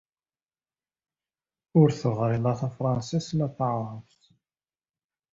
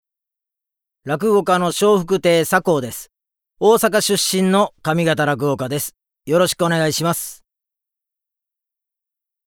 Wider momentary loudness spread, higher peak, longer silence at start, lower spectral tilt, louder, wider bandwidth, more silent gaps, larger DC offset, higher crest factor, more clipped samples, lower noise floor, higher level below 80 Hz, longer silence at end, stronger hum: about the same, 9 LU vs 10 LU; second, -8 dBFS vs 0 dBFS; first, 1.75 s vs 1.05 s; first, -8 dB/octave vs -4.5 dB/octave; second, -26 LUFS vs -17 LUFS; second, 7.8 kHz vs 19.5 kHz; neither; neither; about the same, 22 dB vs 18 dB; neither; first, under -90 dBFS vs -86 dBFS; about the same, -60 dBFS vs -58 dBFS; second, 1.3 s vs 2.15 s; neither